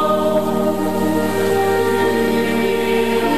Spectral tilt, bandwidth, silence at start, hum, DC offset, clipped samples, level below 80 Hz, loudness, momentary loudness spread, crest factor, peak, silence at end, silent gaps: -5.5 dB/octave; 14 kHz; 0 s; none; 2%; under 0.1%; -54 dBFS; -17 LUFS; 2 LU; 12 dB; -6 dBFS; 0 s; none